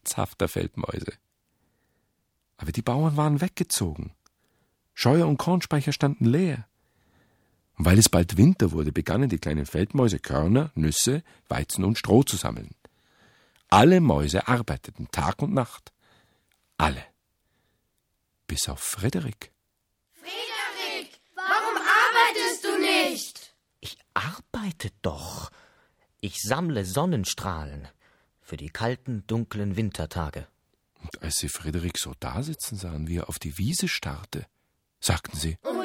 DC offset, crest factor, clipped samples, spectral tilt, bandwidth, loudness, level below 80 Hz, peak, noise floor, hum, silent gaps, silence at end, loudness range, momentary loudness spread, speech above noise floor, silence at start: under 0.1%; 26 dB; under 0.1%; -4.5 dB/octave; 17 kHz; -25 LUFS; -44 dBFS; 0 dBFS; -76 dBFS; none; none; 0 s; 9 LU; 18 LU; 51 dB; 0.05 s